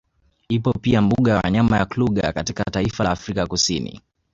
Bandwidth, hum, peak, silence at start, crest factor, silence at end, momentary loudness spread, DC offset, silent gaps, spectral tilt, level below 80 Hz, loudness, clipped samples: 8 kHz; none; -4 dBFS; 0.5 s; 16 dB; 0.35 s; 7 LU; under 0.1%; none; -5.5 dB/octave; -40 dBFS; -20 LUFS; under 0.1%